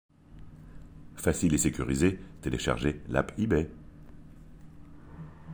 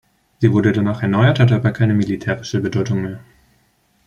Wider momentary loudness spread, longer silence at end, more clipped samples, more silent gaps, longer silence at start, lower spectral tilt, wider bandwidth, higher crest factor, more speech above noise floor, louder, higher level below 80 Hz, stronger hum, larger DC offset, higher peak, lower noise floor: first, 24 LU vs 8 LU; second, 0 s vs 0.9 s; neither; neither; about the same, 0.3 s vs 0.4 s; second, -5.5 dB/octave vs -7.5 dB/octave; first, over 20 kHz vs 7 kHz; about the same, 20 dB vs 16 dB; second, 21 dB vs 44 dB; second, -29 LUFS vs -17 LUFS; about the same, -46 dBFS vs -50 dBFS; neither; neither; second, -10 dBFS vs -2 dBFS; second, -49 dBFS vs -60 dBFS